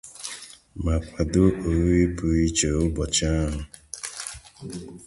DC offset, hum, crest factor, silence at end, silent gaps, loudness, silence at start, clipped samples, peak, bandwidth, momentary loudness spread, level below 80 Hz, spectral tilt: under 0.1%; none; 18 dB; 0 s; none; -24 LUFS; 0.05 s; under 0.1%; -6 dBFS; 11.5 kHz; 17 LU; -32 dBFS; -5 dB/octave